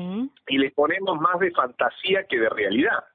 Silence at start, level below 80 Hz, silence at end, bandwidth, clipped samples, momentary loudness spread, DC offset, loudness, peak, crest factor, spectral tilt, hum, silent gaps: 0 s; -64 dBFS; 0.15 s; 4.4 kHz; under 0.1%; 4 LU; under 0.1%; -23 LUFS; -8 dBFS; 16 dB; -9.5 dB/octave; none; none